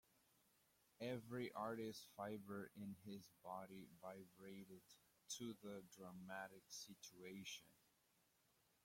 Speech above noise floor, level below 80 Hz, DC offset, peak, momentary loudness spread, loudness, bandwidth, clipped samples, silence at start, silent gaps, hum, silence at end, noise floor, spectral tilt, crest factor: 27 dB; -90 dBFS; under 0.1%; -36 dBFS; 10 LU; -55 LUFS; 16.5 kHz; under 0.1%; 1 s; none; none; 1.05 s; -82 dBFS; -4 dB/octave; 20 dB